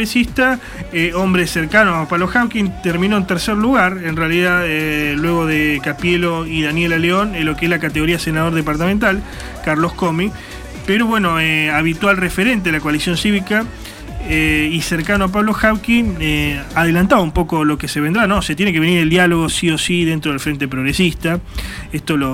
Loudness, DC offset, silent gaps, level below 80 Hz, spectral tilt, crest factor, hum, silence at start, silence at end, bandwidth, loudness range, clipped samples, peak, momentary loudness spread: -16 LUFS; under 0.1%; none; -32 dBFS; -5 dB/octave; 16 dB; none; 0 s; 0 s; 16.5 kHz; 2 LU; under 0.1%; 0 dBFS; 6 LU